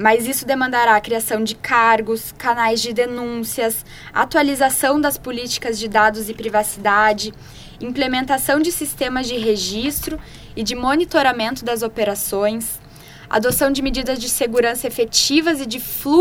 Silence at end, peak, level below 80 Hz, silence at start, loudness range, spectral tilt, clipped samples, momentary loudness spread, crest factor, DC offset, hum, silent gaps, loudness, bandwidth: 0 s; 0 dBFS; -42 dBFS; 0 s; 3 LU; -2.5 dB/octave; under 0.1%; 9 LU; 18 dB; under 0.1%; none; none; -18 LUFS; 17.5 kHz